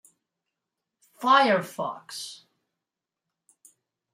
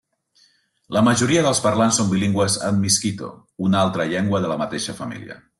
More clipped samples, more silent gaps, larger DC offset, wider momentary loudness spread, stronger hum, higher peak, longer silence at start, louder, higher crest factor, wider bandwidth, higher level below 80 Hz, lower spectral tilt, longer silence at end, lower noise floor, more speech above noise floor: neither; neither; neither; first, 18 LU vs 12 LU; neither; about the same, -6 dBFS vs -6 dBFS; first, 1.2 s vs 0.9 s; second, -24 LUFS vs -19 LUFS; first, 24 dB vs 16 dB; first, 16 kHz vs 12.5 kHz; second, -84 dBFS vs -56 dBFS; about the same, -3.5 dB/octave vs -4.5 dB/octave; first, 1.8 s vs 0.25 s; first, -87 dBFS vs -60 dBFS; first, 63 dB vs 40 dB